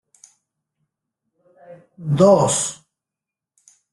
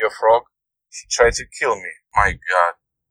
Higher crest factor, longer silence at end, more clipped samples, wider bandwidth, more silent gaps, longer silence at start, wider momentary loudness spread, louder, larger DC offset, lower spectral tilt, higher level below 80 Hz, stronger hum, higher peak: about the same, 22 dB vs 20 dB; first, 1.2 s vs 0.4 s; neither; about the same, 12.5 kHz vs 11.5 kHz; neither; first, 1.7 s vs 0 s; first, 14 LU vs 9 LU; about the same, -17 LUFS vs -19 LUFS; neither; first, -5.5 dB/octave vs -2.5 dB/octave; second, -60 dBFS vs -38 dBFS; neither; about the same, 0 dBFS vs 0 dBFS